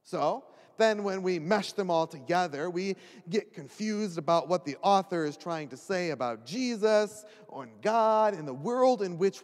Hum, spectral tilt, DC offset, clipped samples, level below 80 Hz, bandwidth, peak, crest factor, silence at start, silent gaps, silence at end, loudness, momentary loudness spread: none; -5 dB/octave; under 0.1%; under 0.1%; -86 dBFS; 13 kHz; -12 dBFS; 18 dB; 0.1 s; none; 0.05 s; -29 LUFS; 11 LU